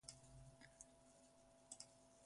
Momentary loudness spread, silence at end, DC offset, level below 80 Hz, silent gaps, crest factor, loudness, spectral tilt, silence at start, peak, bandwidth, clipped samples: 10 LU; 0 s; under 0.1%; -78 dBFS; none; 26 dB; -63 LUFS; -2.5 dB/octave; 0 s; -38 dBFS; 11.5 kHz; under 0.1%